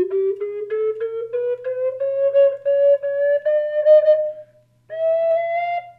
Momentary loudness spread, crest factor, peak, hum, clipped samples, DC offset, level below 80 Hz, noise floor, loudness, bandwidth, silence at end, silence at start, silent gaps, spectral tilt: 11 LU; 14 dB; -4 dBFS; none; under 0.1%; under 0.1%; -76 dBFS; -48 dBFS; -19 LUFS; 4.5 kHz; 0.1 s; 0 s; none; -6.5 dB/octave